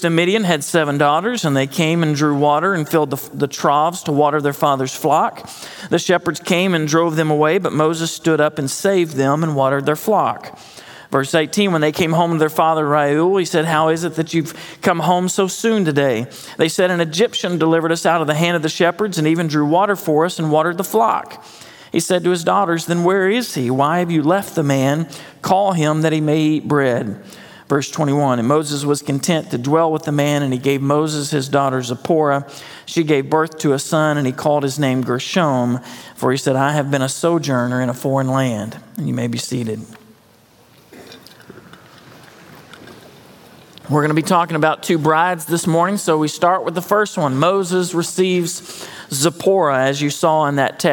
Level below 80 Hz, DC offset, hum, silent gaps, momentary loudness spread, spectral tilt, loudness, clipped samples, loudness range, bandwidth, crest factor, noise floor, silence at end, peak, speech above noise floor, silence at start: -66 dBFS; under 0.1%; none; none; 7 LU; -5 dB/octave; -17 LUFS; under 0.1%; 2 LU; 17.5 kHz; 16 dB; -50 dBFS; 0 s; 0 dBFS; 33 dB; 0 s